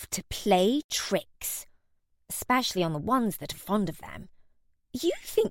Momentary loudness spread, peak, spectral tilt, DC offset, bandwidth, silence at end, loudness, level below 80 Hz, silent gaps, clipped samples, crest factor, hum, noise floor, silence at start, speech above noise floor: 13 LU; -10 dBFS; -4 dB/octave; under 0.1%; 17 kHz; 0 s; -29 LUFS; -56 dBFS; 0.84-0.89 s; under 0.1%; 20 dB; none; -70 dBFS; 0 s; 41 dB